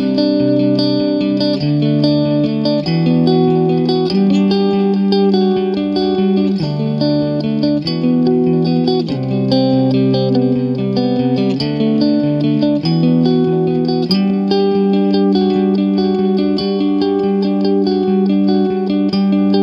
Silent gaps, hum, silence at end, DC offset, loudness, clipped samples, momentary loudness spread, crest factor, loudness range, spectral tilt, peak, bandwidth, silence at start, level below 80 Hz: none; none; 0 s; under 0.1%; -14 LUFS; under 0.1%; 3 LU; 12 dB; 1 LU; -9 dB/octave; -2 dBFS; 7 kHz; 0 s; -50 dBFS